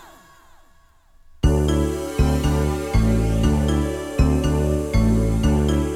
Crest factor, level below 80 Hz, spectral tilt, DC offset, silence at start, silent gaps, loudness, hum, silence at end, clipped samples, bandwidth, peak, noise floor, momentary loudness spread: 16 dB; -24 dBFS; -7 dB/octave; under 0.1%; 1.45 s; none; -20 LUFS; none; 0 s; under 0.1%; 16 kHz; -4 dBFS; -53 dBFS; 3 LU